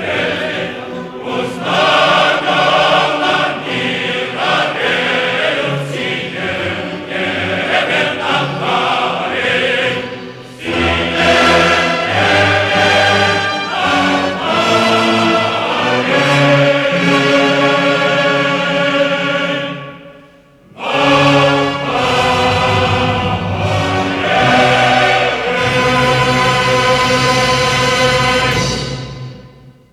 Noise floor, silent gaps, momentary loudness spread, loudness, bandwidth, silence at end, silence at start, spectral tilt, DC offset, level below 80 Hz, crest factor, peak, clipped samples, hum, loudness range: -44 dBFS; none; 9 LU; -13 LUFS; 15.5 kHz; 0.2 s; 0 s; -4.5 dB/octave; under 0.1%; -40 dBFS; 14 dB; 0 dBFS; under 0.1%; none; 4 LU